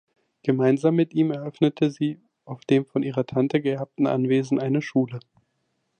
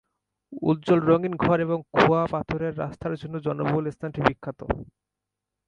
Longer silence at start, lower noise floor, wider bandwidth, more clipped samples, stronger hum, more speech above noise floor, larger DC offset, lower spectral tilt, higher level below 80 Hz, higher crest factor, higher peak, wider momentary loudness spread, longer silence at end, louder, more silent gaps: about the same, 0.45 s vs 0.5 s; second, -74 dBFS vs -85 dBFS; about the same, 9 kHz vs 8.8 kHz; neither; neither; second, 51 dB vs 61 dB; neither; about the same, -8 dB/octave vs -8 dB/octave; second, -68 dBFS vs -48 dBFS; about the same, 18 dB vs 22 dB; second, -6 dBFS vs -2 dBFS; second, 9 LU vs 12 LU; about the same, 0.8 s vs 0.85 s; about the same, -24 LUFS vs -25 LUFS; neither